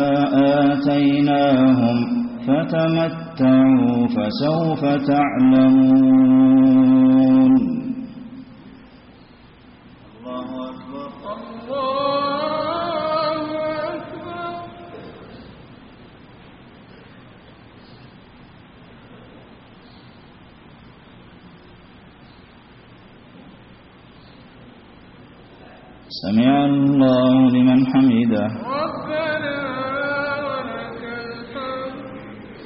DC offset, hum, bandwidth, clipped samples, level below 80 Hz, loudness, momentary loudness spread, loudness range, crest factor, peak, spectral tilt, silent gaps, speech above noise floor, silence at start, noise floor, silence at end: under 0.1%; none; 5.8 kHz; under 0.1%; -54 dBFS; -17 LUFS; 20 LU; 18 LU; 12 dB; -6 dBFS; -6 dB/octave; none; 31 dB; 0 s; -46 dBFS; 0 s